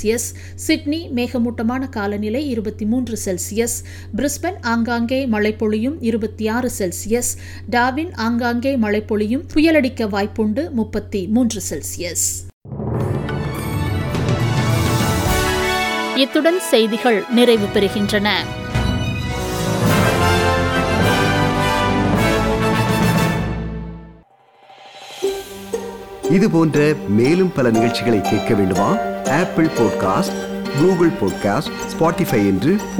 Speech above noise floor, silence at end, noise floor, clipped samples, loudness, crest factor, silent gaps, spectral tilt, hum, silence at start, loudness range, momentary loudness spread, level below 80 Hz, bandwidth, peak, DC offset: 32 dB; 0 s; -50 dBFS; under 0.1%; -18 LUFS; 16 dB; 12.53-12.61 s; -5 dB/octave; none; 0 s; 5 LU; 9 LU; -36 dBFS; 18.5 kHz; -2 dBFS; under 0.1%